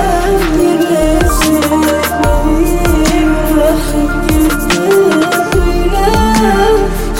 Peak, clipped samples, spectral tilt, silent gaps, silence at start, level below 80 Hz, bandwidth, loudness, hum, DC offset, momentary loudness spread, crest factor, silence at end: 0 dBFS; under 0.1%; -5 dB/octave; none; 0 s; -16 dBFS; 17 kHz; -11 LUFS; none; under 0.1%; 3 LU; 10 dB; 0 s